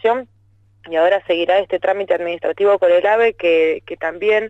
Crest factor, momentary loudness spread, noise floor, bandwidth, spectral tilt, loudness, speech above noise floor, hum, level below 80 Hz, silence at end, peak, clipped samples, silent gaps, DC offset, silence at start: 12 dB; 9 LU; -54 dBFS; 7.8 kHz; -5 dB/octave; -17 LUFS; 37 dB; none; -58 dBFS; 0 s; -6 dBFS; under 0.1%; none; under 0.1%; 0.05 s